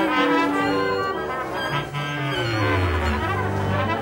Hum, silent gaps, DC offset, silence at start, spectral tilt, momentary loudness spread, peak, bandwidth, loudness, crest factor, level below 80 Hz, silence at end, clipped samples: none; none; under 0.1%; 0 s; -6 dB/octave; 7 LU; -8 dBFS; 16.5 kHz; -23 LUFS; 16 dB; -40 dBFS; 0 s; under 0.1%